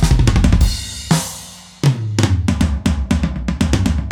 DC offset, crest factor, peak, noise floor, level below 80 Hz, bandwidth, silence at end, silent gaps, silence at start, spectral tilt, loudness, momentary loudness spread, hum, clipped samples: under 0.1%; 14 dB; -2 dBFS; -35 dBFS; -20 dBFS; 17.5 kHz; 0 s; none; 0 s; -5.5 dB/octave; -17 LUFS; 8 LU; none; under 0.1%